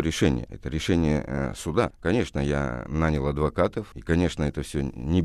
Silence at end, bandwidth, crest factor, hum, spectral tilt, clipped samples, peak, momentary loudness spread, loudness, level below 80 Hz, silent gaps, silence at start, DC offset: 0 s; 13 kHz; 18 dB; none; -6.5 dB/octave; under 0.1%; -6 dBFS; 6 LU; -26 LUFS; -36 dBFS; none; 0 s; under 0.1%